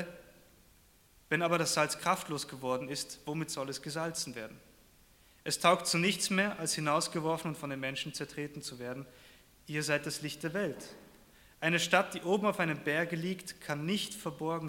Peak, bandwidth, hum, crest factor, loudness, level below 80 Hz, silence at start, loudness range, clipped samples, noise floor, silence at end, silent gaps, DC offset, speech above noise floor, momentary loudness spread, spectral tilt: -10 dBFS; 17 kHz; none; 26 dB; -33 LUFS; -68 dBFS; 0 s; 6 LU; under 0.1%; -63 dBFS; 0 s; none; under 0.1%; 30 dB; 12 LU; -3.5 dB/octave